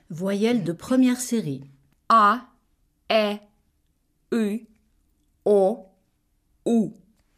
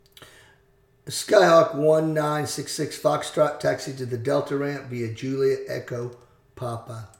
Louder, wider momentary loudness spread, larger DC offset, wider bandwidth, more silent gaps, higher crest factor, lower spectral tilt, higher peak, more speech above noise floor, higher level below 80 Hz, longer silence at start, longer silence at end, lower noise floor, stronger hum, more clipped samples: about the same, -23 LUFS vs -23 LUFS; about the same, 14 LU vs 15 LU; neither; second, 15.5 kHz vs 18 kHz; neither; about the same, 18 dB vs 22 dB; about the same, -5 dB/octave vs -5 dB/octave; second, -8 dBFS vs -2 dBFS; first, 47 dB vs 37 dB; about the same, -66 dBFS vs -64 dBFS; about the same, 0.1 s vs 0.2 s; first, 0.45 s vs 0.1 s; first, -69 dBFS vs -60 dBFS; neither; neither